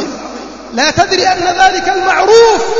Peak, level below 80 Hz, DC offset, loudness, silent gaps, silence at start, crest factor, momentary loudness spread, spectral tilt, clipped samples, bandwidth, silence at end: 0 dBFS; -40 dBFS; under 0.1%; -9 LUFS; none; 0 s; 10 dB; 17 LU; -2.5 dB/octave; 0.1%; 7.8 kHz; 0 s